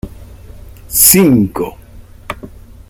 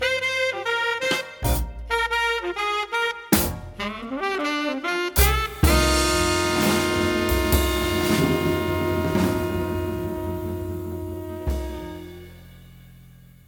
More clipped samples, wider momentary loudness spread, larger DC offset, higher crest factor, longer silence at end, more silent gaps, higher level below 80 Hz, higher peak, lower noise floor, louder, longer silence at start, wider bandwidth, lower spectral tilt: first, 0.3% vs under 0.1%; first, 23 LU vs 11 LU; neither; second, 14 dB vs 20 dB; about the same, 0.4 s vs 0.4 s; neither; about the same, -36 dBFS vs -32 dBFS; first, 0 dBFS vs -4 dBFS; second, -35 dBFS vs -48 dBFS; first, -9 LUFS vs -23 LUFS; about the same, 0.05 s vs 0 s; about the same, over 20 kHz vs 19 kHz; about the same, -4 dB/octave vs -4.5 dB/octave